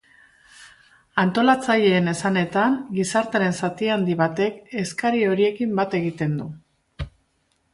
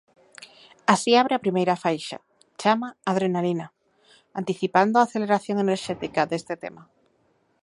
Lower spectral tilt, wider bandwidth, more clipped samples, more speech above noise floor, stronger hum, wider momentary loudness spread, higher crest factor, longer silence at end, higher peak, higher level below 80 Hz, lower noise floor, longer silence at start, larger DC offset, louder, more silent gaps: about the same, -5.5 dB/octave vs -5 dB/octave; about the same, 11.5 kHz vs 11.5 kHz; neither; first, 47 dB vs 43 dB; neither; second, 11 LU vs 15 LU; second, 18 dB vs 24 dB; second, 0.65 s vs 0.8 s; about the same, -4 dBFS vs -2 dBFS; first, -52 dBFS vs -70 dBFS; about the same, -68 dBFS vs -66 dBFS; first, 0.6 s vs 0.4 s; neither; about the same, -22 LUFS vs -24 LUFS; neither